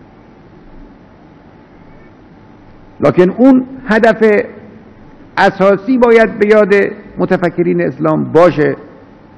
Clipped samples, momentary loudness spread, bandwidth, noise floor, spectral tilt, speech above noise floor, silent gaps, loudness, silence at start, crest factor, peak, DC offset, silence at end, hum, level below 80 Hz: 1%; 7 LU; 11 kHz; -40 dBFS; -7.5 dB/octave; 30 dB; none; -11 LUFS; 0.75 s; 12 dB; 0 dBFS; under 0.1%; 0.5 s; none; -44 dBFS